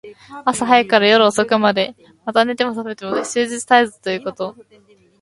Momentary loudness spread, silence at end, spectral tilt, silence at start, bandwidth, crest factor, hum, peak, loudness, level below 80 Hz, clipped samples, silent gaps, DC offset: 14 LU; 0.7 s; -3.5 dB/octave; 0.05 s; 11.5 kHz; 18 dB; none; 0 dBFS; -17 LUFS; -62 dBFS; under 0.1%; none; under 0.1%